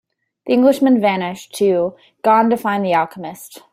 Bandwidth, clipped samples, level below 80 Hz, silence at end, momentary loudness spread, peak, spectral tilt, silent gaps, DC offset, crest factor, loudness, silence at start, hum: 15.5 kHz; under 0.1%; -64 dBFS; 0.15 s; 17 LU; -2 dBFS; -6 dB/octave; none; under 0.1%; 14 dB; -16 LUFS; 0.45 s; none